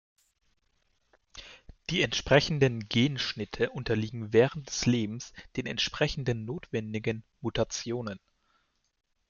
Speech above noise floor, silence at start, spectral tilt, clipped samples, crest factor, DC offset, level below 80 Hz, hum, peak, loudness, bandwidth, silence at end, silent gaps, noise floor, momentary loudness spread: 44 dB; 1.35 s; -5 dB/octave; under 0.1%; 24 dB; under 0.1%; -52 dBFS; none; -8 dBFS; -29 LUFS; 7.4 kHz; 1.1 s; none; -73 dBFS; 14 LU